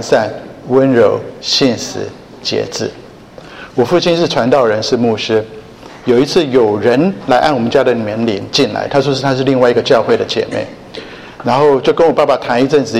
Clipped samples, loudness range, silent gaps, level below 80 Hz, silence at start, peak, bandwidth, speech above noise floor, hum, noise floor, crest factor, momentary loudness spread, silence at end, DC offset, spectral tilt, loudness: under 0.1%; 3 LU; none; -48 dBFS; 0 s; 0 dBFS; 13.5 kHz; 23 dB; none; -35 dBFS; 12 dB; 13 LU; 0 s; under 0.1%; -5 dB/octave; -13 LUFS